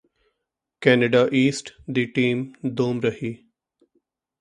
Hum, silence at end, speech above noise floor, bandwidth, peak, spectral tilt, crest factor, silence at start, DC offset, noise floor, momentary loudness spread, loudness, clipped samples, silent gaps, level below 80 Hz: none; 1.05 s; 60 dB; 10.5 kHz; -2 dBFS; -6 dB/octave; 22 dB; 0.8 s; under 0.1%; -82 dBFS; 15 LU; -22 LUFS; under 0.1%; none; -62 dBFS